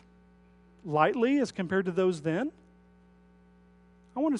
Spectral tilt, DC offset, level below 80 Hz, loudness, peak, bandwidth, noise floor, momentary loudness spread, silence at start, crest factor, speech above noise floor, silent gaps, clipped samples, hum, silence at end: -6.5 dB/octave; under 0.1%; -66 dBFS; -29 LUFS; -10 dBFS; 11 kHz; -59 dBFS; 12 LU; 0.85 s; 22 dB; 32 dB; none; under 0.1%; 60 Hz at -55 dBFS; 0 s